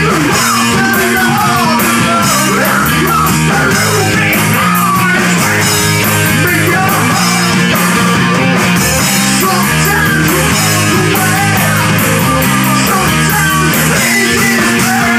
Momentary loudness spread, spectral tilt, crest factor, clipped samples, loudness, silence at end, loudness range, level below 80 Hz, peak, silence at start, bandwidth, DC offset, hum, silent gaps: 1 LU; -3.5 dB/octave; 10 dB; under 0.1%; -9 LUFS; 0 s; 0 LU; -32 dBFS; 0 dBFS; 0 s; 16 kHz; under 0.1%; none; none